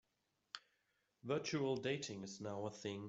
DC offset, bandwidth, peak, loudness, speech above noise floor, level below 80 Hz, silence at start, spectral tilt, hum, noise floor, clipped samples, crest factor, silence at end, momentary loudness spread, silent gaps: under 0.1%; 8 kHz; -28 dBFS; -43 LUFS; 43 dB; -82 dBFS; 0.55 s; -5 dB/octave; none; -85 dBFS; under 0.1%; 18 dB; 0 s; 15 LU; none